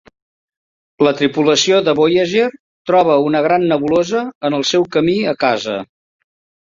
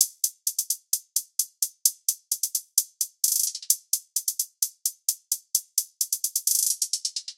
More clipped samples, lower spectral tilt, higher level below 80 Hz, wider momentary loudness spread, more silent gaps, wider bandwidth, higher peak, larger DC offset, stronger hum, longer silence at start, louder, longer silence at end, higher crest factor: neither; first, -4.5 dB/octave vs 8.5 dB/octave; first, -56 dBFS vs under -90 dBFS; about the same, 7 LU vs 6 LU; first, 2.60-2.85 s, 4.35-4.41 s vs none; second, 7.6 kHz vs 17 kHz; about the same, 0 dBFS vs 0 dBFS; neither; neither; first, 1 s vs 0 s; first, -15 LUFS vs -25 LUFS; first, 0.8 s vs 0.05 s; second, 16 dB vs 28 dB